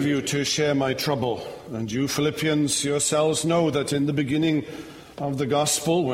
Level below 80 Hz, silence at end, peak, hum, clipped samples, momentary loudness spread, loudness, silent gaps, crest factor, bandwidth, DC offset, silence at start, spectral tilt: -56 dBFS; 0 s; -10 dBFS; none; under 0.1%; 11 LU; -23 LUFS; none; 14 dB; 16 kHz; under 0.1%; 0 s; -4 dB/octave